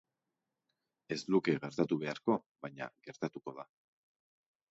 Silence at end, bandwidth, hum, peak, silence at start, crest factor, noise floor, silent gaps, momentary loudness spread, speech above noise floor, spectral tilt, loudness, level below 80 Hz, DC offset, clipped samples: 1.05 s; 7.6 kHz; none; -16 dBFS; 1.1 s; 22 dB; -89 dBFS; 2.46-2.55 s; 16 LU; 53 dB; -5.5 dB/octave; -36 LUFS; -80 dBFS; under 0.1%; under 0.1%